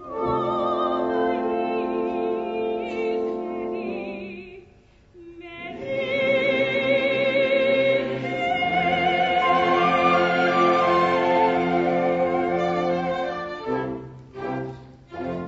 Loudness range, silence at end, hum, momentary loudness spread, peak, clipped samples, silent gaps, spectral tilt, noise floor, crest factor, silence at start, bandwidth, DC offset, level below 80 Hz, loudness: 9 LU; 0 s; none; 15 LU; -8 dBFS; under 0.1%; none; -6.5 dB/octave; -53 dBFS; 16 dB; 0 s; 7.8 kHz; under 0.1%; -56 dBFS; -22 LUFS